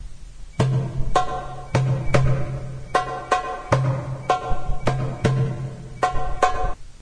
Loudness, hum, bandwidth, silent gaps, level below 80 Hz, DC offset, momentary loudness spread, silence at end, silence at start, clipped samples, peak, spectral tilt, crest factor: -24 LUFS; none; 10.5 kHz; none; -32 dBFS; under 0.1%; 10 LU; 0.05 s; 0 s; under 0.1%; -2 dBFS; -6.5 dB/octave; 20 dB